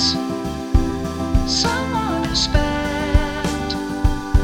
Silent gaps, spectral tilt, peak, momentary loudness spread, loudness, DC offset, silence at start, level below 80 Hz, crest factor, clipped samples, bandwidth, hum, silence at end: none; -4.5 dB/octave; -2 dBFS; 6 LU; -20 LUFS; under 0.1%; 0 s; -22 dBFS; 16 dB; under 0.1%; 16.5 kHz; none; 0 s